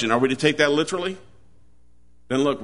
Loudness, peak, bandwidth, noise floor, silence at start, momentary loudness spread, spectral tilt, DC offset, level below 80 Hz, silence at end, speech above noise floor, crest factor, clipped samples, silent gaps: -22 LUFS; -4 dBFS; 11 kHz; -59 dBFS; 0 s; 11 LU; -4.5 dB/octave; 0.4%; -58 dBFS; 0 s; 38 dB; 20 dB; under 0.1%; none